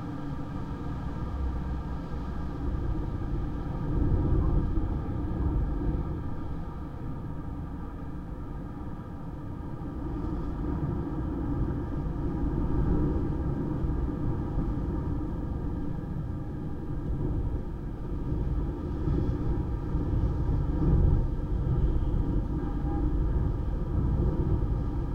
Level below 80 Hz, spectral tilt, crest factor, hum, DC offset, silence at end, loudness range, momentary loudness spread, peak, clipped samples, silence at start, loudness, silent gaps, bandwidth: -32 dBFS; -10.5 dB/octave; 16 dB; none; under 0.1%; 0 s; 7 LU; 10 LU; -12 dBFS; under 0.1%; 0 s; -32 LUFS; none; 5.4 kHz